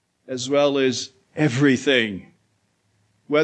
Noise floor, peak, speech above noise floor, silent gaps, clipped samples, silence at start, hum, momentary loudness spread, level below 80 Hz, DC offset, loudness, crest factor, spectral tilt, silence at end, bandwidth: -67 dBFS; -4 dBFS; 47 dB; none; under 0.1%; 0.3 s; none; 14 LU; -68 dBFS; under 0.1%; -21 LUFS; 18 dB; -5 dB/octave; 0 s; 9 kHz